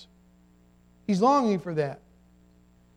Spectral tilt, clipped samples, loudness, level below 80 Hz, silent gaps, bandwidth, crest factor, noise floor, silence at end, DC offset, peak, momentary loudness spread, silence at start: -7 dB/octave; under 0.1%; -25 LUFS; -64 dBFS; none; 11 kHz; 20 dB; -59 dBFS; 1 s; under 0.1%; -10 dBFS; 17 LU; 0 s